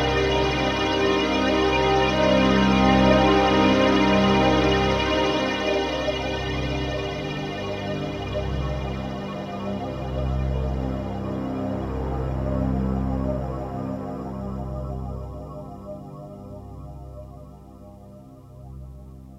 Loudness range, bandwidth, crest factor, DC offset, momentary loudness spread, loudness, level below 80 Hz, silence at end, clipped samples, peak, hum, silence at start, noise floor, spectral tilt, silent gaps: 18 LU; 12 kHz; 20 dB; under 0.1%; 21 LU; -23 LUFS; -34 dBFS; 0 s; under 0.1%; -4 dBFS; 50 Hz at -45 dBFS; 0 s; -44 dBFS; -6 dB/octave; none